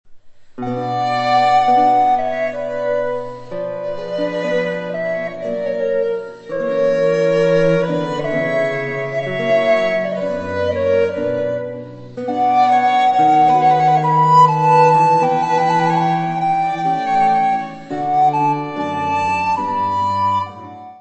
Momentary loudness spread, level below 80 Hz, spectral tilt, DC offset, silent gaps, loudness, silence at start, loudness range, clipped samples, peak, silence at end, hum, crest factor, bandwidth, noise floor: 12 LU; -54 dBFS; -6.5 dB/octave; 0.1%; none; -16 LUFS; 0.05 s; 8 LU; under 0.1%; 0 dBFS; 0.05 s; none; 16 dB; 8.4 kHz; -37 dBFS